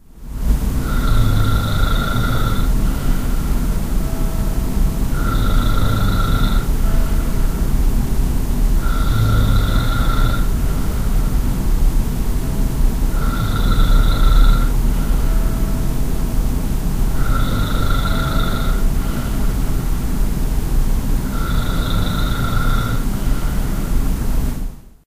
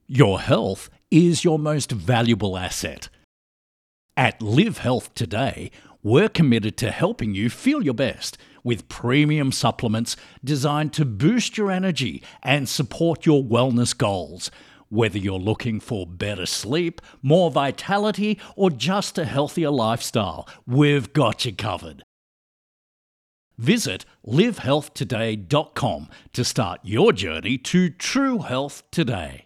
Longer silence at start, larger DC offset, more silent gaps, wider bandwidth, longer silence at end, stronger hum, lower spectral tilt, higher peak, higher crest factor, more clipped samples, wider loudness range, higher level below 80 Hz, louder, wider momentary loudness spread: about the same, 0.15 s vs 0.1 s; neither; second, none vs 3.24-4.09 s, 22.03-23.51 s; about the same, 15.5 kHz vs 15 kHz; first, 0.3 s vs 0.05 s; neither; about the same, -6 dB/octave vs -5.5 dB/octave; about the same, -2 dBFS vs 0 dBFS; second, 14 dB vs 22 dB; neither; about the same, 2 LU vs 3 LU; first, -16 dBFS vs -52 dBFS; about the same, -20 LUFS vs -22 LUFS; second, 5 LU vs 10 LU